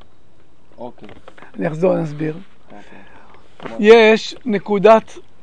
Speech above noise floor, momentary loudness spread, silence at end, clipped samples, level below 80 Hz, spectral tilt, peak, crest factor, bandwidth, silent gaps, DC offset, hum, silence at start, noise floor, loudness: 38 dB; 26 LU; 0.4 s; 0.1%; -56 dBFS; -6 dB/octave; 0 dBFS; 18 dB; 9 kHz; none; 2%; none; 0.8 s; -54 dBFS; -14 LUFS